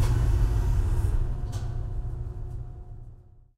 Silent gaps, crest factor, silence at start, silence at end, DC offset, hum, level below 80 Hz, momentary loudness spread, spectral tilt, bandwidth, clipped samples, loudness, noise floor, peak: none; 14 dB; 0 s; 0.15 s; under 0.1%; none; -28 dBFS; 19 LU; -7 dB/octave; 13 kHz; under 0.1%; -30 LUFS; -48 dBFS; -12 dBFS